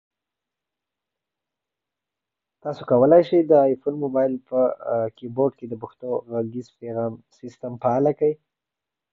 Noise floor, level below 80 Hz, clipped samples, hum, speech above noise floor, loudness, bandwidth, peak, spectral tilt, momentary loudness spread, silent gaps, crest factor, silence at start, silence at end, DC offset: -87 dBFS; -66 dBFS; under 0.1%; none; 65 dB; -22 LUFS; 6.4 kHz; -4 dBFS; -9.5 dB/octave; 18 LU; none; 20 dB; 2.65 s; 0.75 s; under 0.1%